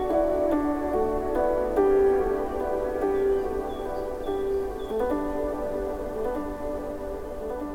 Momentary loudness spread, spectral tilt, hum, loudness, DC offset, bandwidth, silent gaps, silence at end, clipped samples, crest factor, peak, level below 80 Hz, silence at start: 10 LU; -7 dB/octave; none; -27 LUFS; under 0.1%; 16.5 kHz; none; 0 s; under 0.1%; 16 dB; -10 dBFS; -40 dBFS; 0 s